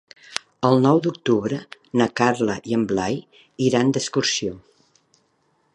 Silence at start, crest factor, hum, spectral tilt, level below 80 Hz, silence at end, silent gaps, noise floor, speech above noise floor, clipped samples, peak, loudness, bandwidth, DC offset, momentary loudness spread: 0.3 s; 22 dB; none; -5 dB/octave; -58 dBFS; 1.15 s; none; -66 dBFS; 45 dB; under 0.1%; 0 dBFS; -22 LUFS; 11.5 kHz; under 0.1%; 13 LU